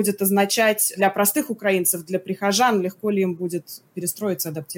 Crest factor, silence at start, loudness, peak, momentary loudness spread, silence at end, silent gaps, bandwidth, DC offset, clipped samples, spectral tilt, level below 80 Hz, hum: 16 dB; 0 s; -21 LUFS; -6 dBFS; 10 LU; 0 s; none; 17 kHz; under 0.1%; under 0.1%; -3.5 dB/octave; -74 dBFS; none